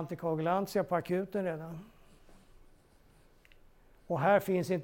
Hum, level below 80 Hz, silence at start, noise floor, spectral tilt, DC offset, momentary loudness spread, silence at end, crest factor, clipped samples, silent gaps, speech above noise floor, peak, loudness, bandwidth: none; -64 dBFS; 0 s; -62 dBFS; -7 dB/octave; under 0.1%; 13 LU; 0 s; 22 dB; under 0.1%; none; 31 dB; -14 dBFS; -32 LUFS; 17 kHz